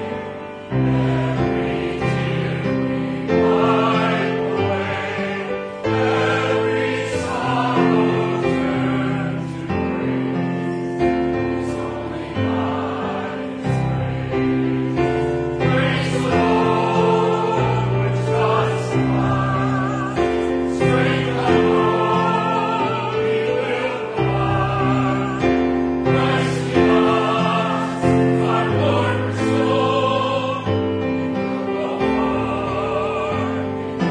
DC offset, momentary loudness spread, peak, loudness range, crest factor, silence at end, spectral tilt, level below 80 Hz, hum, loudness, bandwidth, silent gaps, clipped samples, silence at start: under 0.1%; 6 LU; -4 dBFS; 4 LU; 16 dB; 0 s; -7 dB/octave; -42 dBFS; none; -20 LUFS; 10.5 kHz; none; under 0.1%; 0 s